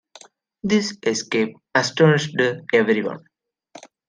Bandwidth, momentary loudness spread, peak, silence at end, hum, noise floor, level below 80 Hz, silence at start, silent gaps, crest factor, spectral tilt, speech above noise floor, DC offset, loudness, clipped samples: 10 kHz; 9 LU; -4 dBFS; 0.3 s; none; -49 dBFS; -64 dBFS; 0.65 s; none; 18 dB; -5 dB/octave; 29 dB; under 0.1%; -20 LUFS; under 0.1%